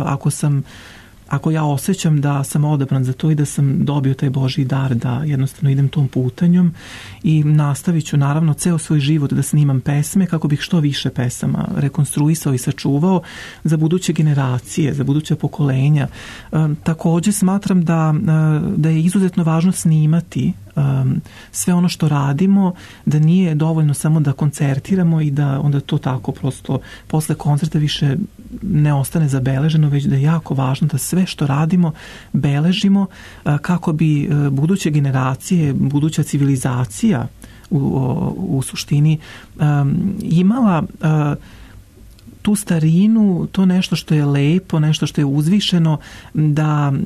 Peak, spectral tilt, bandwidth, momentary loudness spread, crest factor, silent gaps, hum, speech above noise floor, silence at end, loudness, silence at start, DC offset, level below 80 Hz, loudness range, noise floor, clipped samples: -6 dBFS; -6.5 dB/octave; 13.5 kHz; 6 LU; 10 dB; none; none; 26 dB; 0 s; -17 LUFS; 0 s; under 0.1%; -44 dBFS; 3 LU; -41 dBFS; under 0.1%